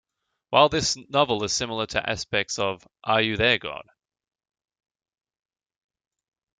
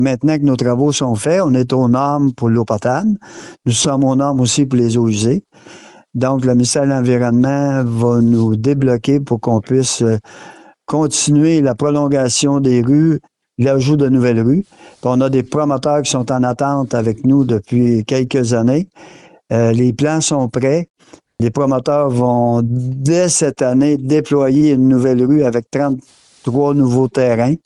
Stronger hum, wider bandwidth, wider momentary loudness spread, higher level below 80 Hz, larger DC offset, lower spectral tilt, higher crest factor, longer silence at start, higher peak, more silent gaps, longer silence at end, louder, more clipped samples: neither; second, 9.6 kHz vs 11.5 kHz; first, 9 LU vs 6 LU; second, -54 dBFS vs -48 dBFS; neither; second, -3 dB/octave vs -6 dB/octave; first, 24 dB vs 10 dB; first, 0.5 s vs 0 s; about the same, -2 dBFS vs -4 dBFS; second, none vs 20.90-20.94 s; first, 2.8 s vs 0.1 s; second, -23 LUFS vs -14 LUFS; neither